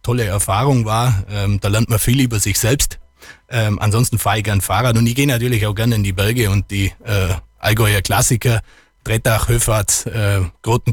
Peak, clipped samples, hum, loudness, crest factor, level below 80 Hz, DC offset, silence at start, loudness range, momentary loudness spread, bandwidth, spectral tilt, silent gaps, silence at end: -4 dBFS; under 0.1%; none; -16 LUFS; 12 dB; -32 dBFS; under 0.1%; 0.05 s; 1 LU; 5 LU; 18.5 kHz; -4.5 dB/octave; none; 0 s